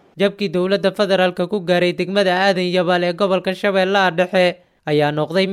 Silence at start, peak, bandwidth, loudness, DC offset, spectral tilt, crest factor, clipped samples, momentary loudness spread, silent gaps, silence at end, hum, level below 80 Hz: 0.15 s; -4 dBFS; 13 kHz; -17 LUFS; under 0.1%; -6 dB/octave; 14 dB; under 0.1%; 4 LU; none; 0 s; none; -62 dBFS